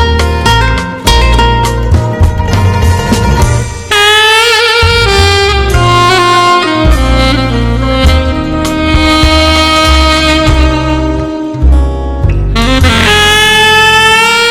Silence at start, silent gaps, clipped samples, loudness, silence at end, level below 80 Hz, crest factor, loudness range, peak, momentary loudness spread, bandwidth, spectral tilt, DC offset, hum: 0 s; none; 2%; -7 LUFS; 0 s; -12 dBFS; 8 dB; 3 LU; 0 dBFS; 8 LU; 17 kHz; -4.5 dB/octave; under 0.1%; none